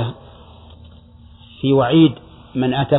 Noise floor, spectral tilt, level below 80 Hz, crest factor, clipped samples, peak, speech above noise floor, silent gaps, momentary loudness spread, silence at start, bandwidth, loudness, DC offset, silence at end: -44 dBFS; -11 dB/octave; -46 dBFS; 16 dB; under 0.1%; -2 dBFS; 29 dB; none; 21 LU; 0 s; 4.1 kHz; -17 LUFS; under 0.1%; 0 s